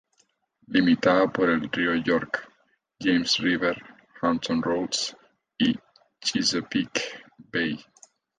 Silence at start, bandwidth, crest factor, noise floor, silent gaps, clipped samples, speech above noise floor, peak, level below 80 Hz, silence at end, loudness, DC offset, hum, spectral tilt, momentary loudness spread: 0.7 s; 9.6 kHz; 18 dB; -68 dBFS; none; under 0.1%; 44 dB; -8 dBFS; -60 dBFS; 0.55 s; -25 LUFS; under 0.1%; none; -4 dB/octave; 11 LU